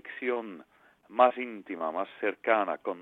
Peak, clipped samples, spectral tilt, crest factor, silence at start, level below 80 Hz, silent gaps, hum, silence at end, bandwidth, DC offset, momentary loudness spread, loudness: -8 dBFS; under 0.1%; -6.5 dB/octave; 22 dB; 0.05 s; -80 dBFS; none; none; 0 s; 4 kHz; under 0.1%; 13 LU; -30 LUFS